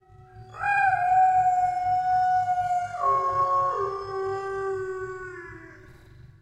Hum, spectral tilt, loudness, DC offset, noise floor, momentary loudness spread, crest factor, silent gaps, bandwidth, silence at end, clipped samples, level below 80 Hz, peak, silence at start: none; -5.5 dB/octave; -24 LUFS; under 0.1%; -49 dBFS; 17 LU; 14 dB; none; 9.6 kHz; 0.15 s; under 0.1%; -56 dBFS; -12 dBFS; 0.2 s